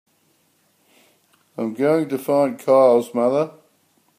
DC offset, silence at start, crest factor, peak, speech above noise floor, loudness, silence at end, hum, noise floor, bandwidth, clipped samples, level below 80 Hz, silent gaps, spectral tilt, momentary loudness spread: under 0.1%; 1.6 s; 16 dB; -4 dBFS; 45 dB; -19 LUFS; 0.7 s; none; -63 dBFS; 15.5 kHz; under 0.1%; -74 dBFS; none; -7 dB/octave; 14 LU